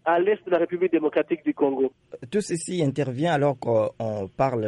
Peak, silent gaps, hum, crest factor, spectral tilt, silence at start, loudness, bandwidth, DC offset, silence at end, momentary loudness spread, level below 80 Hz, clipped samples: -10 dBFS; none; none; 14 dB; -6.5 dB/octave; 0.05 s; -25 LUFS; 11.5 kHz; under 0.1%; 0 s; 6 LU; -62 dBFS; under 0.1%